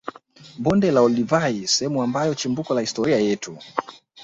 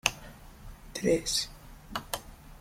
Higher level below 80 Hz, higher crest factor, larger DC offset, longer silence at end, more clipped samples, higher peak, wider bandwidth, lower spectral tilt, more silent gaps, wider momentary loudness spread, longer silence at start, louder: second, -56 dBFS vs -50 dBFS; second, 20 dB vs 30 dB; neither; about the same, 0 s vs 0 s; neither; about the same, -2 dBFS vs -4 dBFS; second, 8.2 kHz vs 16.5 kHz; first, -4.5 dB/octave vs -2.5 dB/octave; neither; second, 11 LU vs 23 LU; about the same, 0.05 s vs 0.05 s; first, -21 LUFS vs -32 LUFS